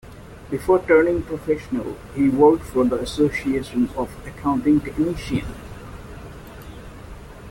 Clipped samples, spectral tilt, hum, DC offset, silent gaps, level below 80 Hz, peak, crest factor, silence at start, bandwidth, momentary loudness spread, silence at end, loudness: under 0.1%; -7 dB/octave; none; under 0.1%; none; -40 dBFS; -2 dBFS; 18 dB; 0.05 s; 17 kHz; 23 LU; 0 s; -21 LUFS